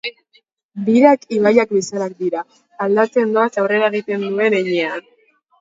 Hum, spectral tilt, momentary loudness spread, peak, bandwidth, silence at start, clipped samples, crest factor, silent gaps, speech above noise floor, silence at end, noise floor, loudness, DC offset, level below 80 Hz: none; -5.5 dB/octave; 13 LU; 0 dBFS; 7.8 kHz; 0.05 s; under 0.1%; 18 dB; 0.63-0.69 s; 42 dB; 0.6 s; -58 dBFS; -17 LUFS; under 0.1%; -68 dBFS